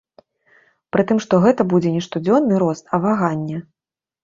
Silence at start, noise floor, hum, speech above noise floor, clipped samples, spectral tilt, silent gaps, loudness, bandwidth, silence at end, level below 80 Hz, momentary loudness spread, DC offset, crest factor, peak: 0.95 s; -57 dBFS; none; 39 dB; under 0.1%; -7.5 dB/octave; none; -18 LUFS; 7.6 kHz; 0.6 s; -58 dBFS; 8 LU; under 0.1%; 18 dB; -2 dBFS